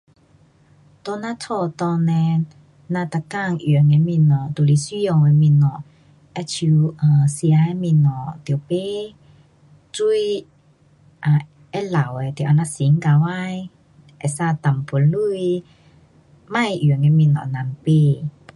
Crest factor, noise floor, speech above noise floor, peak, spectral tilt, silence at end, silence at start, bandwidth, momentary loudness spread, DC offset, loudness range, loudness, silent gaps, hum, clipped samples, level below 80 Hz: 14 dB; -54 dBFS; 37 dB; -4 dBFS; -7.5 dB/octave; 0.25 s; 1.05 s; 11.5 kHz; 13 LU; under 0.1%; 6 LU; -19 LUFS; none; none; under 0.1%; -58 dBFS